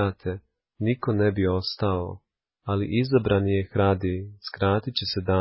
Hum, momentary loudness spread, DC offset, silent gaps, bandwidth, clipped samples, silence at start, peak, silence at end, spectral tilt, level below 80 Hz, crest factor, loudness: none; 12 LU; under 0.1%; none; 5.8 kHz; under 0.1%; 0 s; -8 dBFS; 0 s; -10.5 dB/octave; -42 dBFS; 16 dB; -25 LUFS